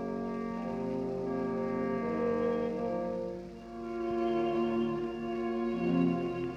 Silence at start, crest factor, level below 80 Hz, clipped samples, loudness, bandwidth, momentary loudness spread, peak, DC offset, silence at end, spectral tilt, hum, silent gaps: 0 s; 16 dB; -58 dBFS; under 0.1%; -33 LUFS; 7.6 kHz; 6 LU; -18 dBFS; under 0.1%; 0 s; -8.5 dB/octave; none; none